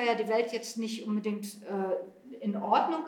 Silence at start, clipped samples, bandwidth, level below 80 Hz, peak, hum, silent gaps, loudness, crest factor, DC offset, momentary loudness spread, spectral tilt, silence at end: 0 s; under 0.1%; 18 kHz; -88 dBFS; -14 dBFS; none; none; -32 LUFS; 18 dB; under 0.1%; 10 LU; -5 dB/octave; 0 s